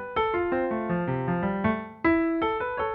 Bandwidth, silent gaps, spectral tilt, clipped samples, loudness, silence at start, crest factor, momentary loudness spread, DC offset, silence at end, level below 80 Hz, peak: 4.7 kHz; none; -10 dB/octave; under 0.1%; -27 LUFS; 0 s; 16 dB; 4 LU; under 0.1%; 0 s; -50 dBFS; -10 dBFS